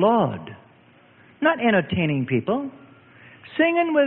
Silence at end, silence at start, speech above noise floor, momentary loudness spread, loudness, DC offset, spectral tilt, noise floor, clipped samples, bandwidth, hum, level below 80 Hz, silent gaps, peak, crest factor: 0 s; 0 s; 33 dB; 15 LU; -22 LUFS; under 0.1%; -11 dB/octave; -53 dBFS; under 0.1%; 4.2 kHz; none; -58 dBFS; none; -6 dBFS; 16 dB